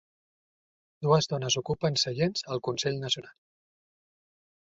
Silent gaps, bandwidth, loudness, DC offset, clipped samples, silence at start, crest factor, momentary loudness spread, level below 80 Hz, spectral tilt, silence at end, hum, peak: none; 7.8 kHz; -28 LUFS; under 0.1%; under 0.1%; 1 s; 22 dB; 7 LU; -64 dBFS; -4.5 dB/octave; 1.4 s; none; -10 dBFS